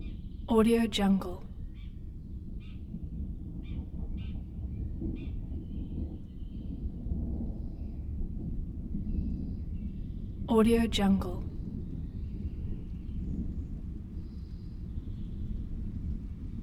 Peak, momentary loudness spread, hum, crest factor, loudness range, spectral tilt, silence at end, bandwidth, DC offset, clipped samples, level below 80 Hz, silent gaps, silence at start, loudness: -12 dBFS; 17 LU; none; 20 dB; 9 LU; -7 dB/octave; 0 s; 15 kHz; under 0.1%; under 0.1%; -38 dBFS; none; 0 s; -35 LUFS